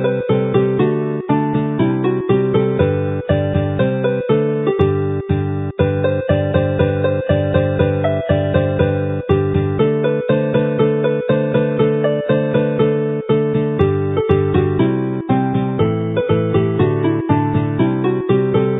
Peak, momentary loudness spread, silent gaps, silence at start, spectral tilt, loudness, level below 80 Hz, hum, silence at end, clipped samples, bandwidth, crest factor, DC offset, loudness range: 0 dBFS; 3 LU; none; 0 s; -12 dB/octave; -17 LUFS; -34 dBFS; none; 0 s; under 0.1%; 4 kHz; 16 dB; under 0.1%; 1 LU